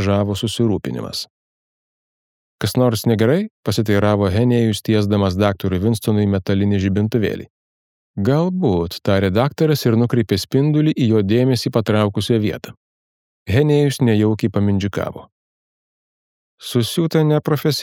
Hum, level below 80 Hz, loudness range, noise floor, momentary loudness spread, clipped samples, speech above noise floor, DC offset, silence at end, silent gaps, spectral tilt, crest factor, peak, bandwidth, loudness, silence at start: none; -50 dBFS; 4 LU; under -90 dBFS; 8 LU; under 0.1%; over 73 dB; under 0.1%; 0 s; 1.30-2.58 s, 3.50-3.63 s, 7.50-8.14 s, 12.77-13.46 s, 15.32-16.58 s; -6.5 dB/octave; 16 dB; -2 dBFS; 17.5 kHz; -18 LUFS; 0 s